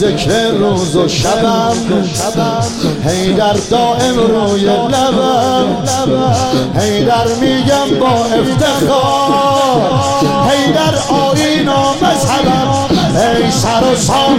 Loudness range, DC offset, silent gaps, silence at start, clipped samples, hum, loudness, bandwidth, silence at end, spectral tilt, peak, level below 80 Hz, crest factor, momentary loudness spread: 2 LU; 0.3%; none; 0 s; under 0.1%; none; -11 LUFS; 16.5 kHz; 0 s; -5 dB/octave; 0 dBFS; -36 dBFS; 12 dB; 3 LU